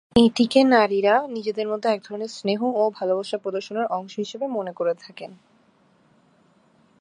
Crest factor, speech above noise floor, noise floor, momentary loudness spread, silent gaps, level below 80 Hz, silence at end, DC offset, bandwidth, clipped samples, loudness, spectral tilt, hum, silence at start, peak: 22 dB; 38 dB; -60 dBFS; 14 LU; none; -56 dBFS; 1.65 s; under 0.1%; 11 kHz; under 0.1%; -23 LUFS; -5 dB/octave; none; 0.15 s; -2 dBFS